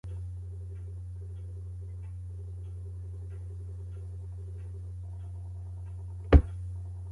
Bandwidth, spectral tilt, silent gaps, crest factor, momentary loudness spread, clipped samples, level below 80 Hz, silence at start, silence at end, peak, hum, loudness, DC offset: 4.7 kHz; -9 dB/octave; none; 28 dB; 13 LU; under 0.1%; -36 dBFS; 0.05 s; 0 s; -6 dBFS; none; -35 LUFS; under 0.1%